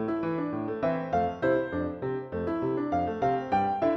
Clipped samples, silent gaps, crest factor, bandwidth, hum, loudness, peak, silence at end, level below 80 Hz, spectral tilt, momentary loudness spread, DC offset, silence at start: under 0.1%; none; 14 dB; 6.2 kHz; none; -29 LUFS; -14 dBFS; 0 s; -56 dBFS; -8.5 dB/octave; 5 LU; under 0.1%; 0 s